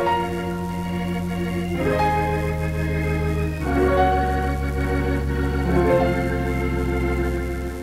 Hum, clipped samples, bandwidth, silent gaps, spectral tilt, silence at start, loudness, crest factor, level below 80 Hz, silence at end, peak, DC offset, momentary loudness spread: none; under 0.1%; 16 kHz; none; -7.5 dB/octave; 0 s; -22 LUFS; 14 dB; -28 dBFS; 0 s; -6 dBFS; under 0.1%; 7 LU